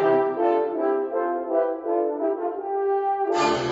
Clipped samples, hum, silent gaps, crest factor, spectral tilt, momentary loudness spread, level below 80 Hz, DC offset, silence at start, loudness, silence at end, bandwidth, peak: under 0.1%; none; none; 14 dB; -5.5 dB/octave; 4 LU; -64 dBFS; under 0.1%; 0 s; -24 LUFS; 0 s; 8 kHz; -10 dBFS